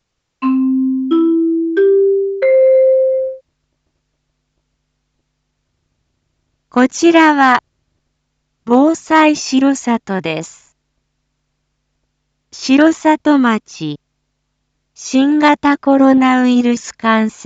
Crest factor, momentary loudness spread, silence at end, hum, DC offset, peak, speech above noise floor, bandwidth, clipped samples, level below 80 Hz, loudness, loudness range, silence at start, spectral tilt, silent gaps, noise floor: 14 dB; 13 LU; 0 s; none; under 0.1%; 0 dBFS; 57 dB; 8 kHz; under 0.1%; -60 dBFS; -13 LUFS; 7 LU; 0.4 s; -4.5 dB/octave; none; -69 dBFS